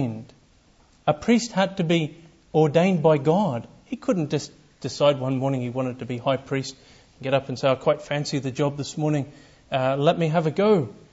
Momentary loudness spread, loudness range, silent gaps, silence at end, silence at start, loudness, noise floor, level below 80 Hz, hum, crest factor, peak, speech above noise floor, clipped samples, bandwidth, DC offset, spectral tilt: 11 LU; 4 LU; none; 0.2 s; 0 s; -23 LUFS; -57 dBFS; -60 dBFS; none; 18 dB; -6 dBFS; 35 dB; under 0.1%; 8 kHz; under 0.1%; -6.5 dB/octave